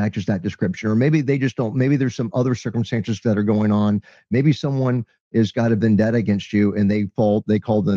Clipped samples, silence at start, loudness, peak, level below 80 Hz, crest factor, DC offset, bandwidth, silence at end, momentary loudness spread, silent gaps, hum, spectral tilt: under 0.1%; 0 s; -20 LUFS; -6 dBFS; -56 dBFS; 14 dB; under 0.1%; 7.2 kHz; 0 s; 6 LU; 5.20-5.31 s; none; -8 dB/octave